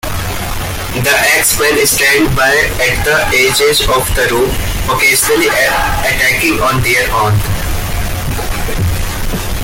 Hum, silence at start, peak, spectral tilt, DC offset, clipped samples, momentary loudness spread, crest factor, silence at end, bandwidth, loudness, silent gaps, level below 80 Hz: none; 0.05 s; 0 dBFS; -3 dB/octave; under 0.1%; under 0.1%; 10 LU; 12 dB; 0 s; 17 kHz; -11 LUFS; none; -22 dBFS